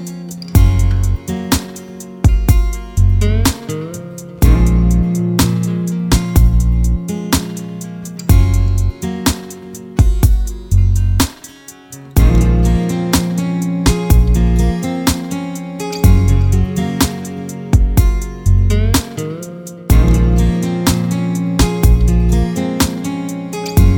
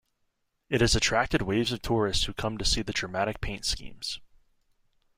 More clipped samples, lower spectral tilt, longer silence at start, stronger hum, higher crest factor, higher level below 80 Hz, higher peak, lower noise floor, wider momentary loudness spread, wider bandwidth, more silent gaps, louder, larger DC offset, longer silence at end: neither; first, -6 dB/octave vs -3.5 dB/octave; second, 0 s vs 0.7 s; neither; second, 12 dB vs 20 dB; first, -16 dBFS vs -40 dBFS; first, 0 dBFS vs -8 dBFS; second, -37 dBFS vs -76 dBFS; first, 13 LU vs 10 LU; first, 20 kHz vs 16 kHz; neither; first, -15 LUFS vs -28 LUFS; neither; second, 0 s vs 0.95 s